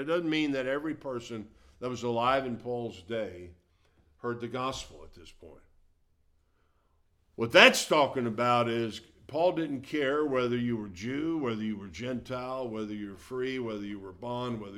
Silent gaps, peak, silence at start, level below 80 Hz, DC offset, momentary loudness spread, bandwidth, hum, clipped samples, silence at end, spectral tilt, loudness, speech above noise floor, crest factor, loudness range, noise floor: none; -2 dBFS; 0 s; -62 dBFS; under 0.1%; 14 LU; 16 kHz; none; under 0.1%; 0 s; -4 dB/octave; -29 LUFS; 39 dB; 28 dB; 15 LU; -70 dBFS